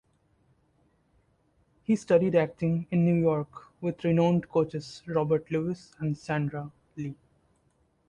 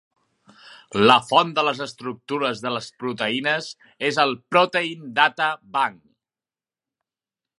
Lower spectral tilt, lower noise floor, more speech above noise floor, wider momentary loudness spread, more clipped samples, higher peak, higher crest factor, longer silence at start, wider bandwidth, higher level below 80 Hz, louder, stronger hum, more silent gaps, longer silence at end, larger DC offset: first, -8 dB/octave vs -4 dB/octave; second, -69 dBFS vs under -90 dBFS; second, 42 dB vs over 68 dB; about the same, 15 LU vs 13 LU; neither; second, -10 dBFS vs 0 dBFS; about the same, 18 dB vs 22 dB; first, 1.9 s vs 0.7 s; second, 9.6 kHz vs 11.5 kHz; about the same, -62 dBFS vs -66 dBFS; second, -28 LUFS vs -21 LUFS; neither; neither; second, 0.95 s vs 1.65 s; neither